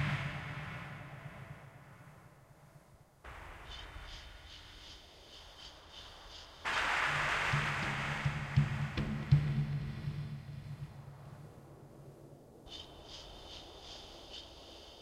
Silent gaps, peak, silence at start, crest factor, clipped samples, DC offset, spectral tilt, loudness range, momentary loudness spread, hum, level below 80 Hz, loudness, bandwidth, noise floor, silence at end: none; -14 dBFS; 0 s; 26 dB; under 0.1%; under 0.1%; -5.5 dB/octave; 18 LU; 23 LU; none; -54 dBFS; -37 LUFS; 12.5 kHz; -61 dBFS; 0 s